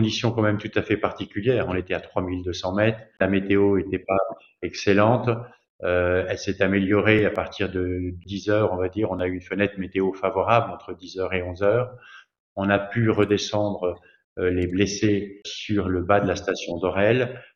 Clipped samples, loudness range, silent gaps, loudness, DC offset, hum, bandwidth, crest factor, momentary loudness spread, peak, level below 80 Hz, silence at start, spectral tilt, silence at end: under 0.1%; 2 LU; 5.69-5.79 s, 12.40-12.56 s, 14.24-14.36 s; -24 LUFS; under 0.1%; none; 7.4 kHz; 20 dB; 10 LU; -2 dBFS; -56 dBFS; 0 s; -6 dB/octave; 0.15 s